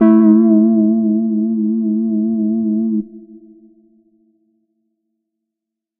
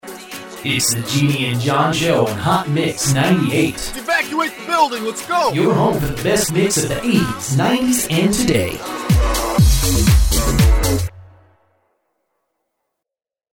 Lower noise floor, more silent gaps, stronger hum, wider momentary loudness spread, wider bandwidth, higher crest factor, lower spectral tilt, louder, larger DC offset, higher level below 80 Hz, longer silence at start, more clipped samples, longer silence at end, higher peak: second, -82 dBFS vs -87 dBFS; neither; neither; about the same, 8 LU vs 6 LU; second, 2.4 kHz vs 19.5 kHz; about the same, 16 dB vs 16 dB; first, -12 dB/octave vs -4.5 dB/octave; first, -14 LUFS vs -17 LUFS; neither; second, -68 dBFS vs -24 dBFS; about the same, 0 s vs 0.05 s; neither; first, 2.65 s vs 2.3 s; about the same, 0 dBFS vs -2 dBFS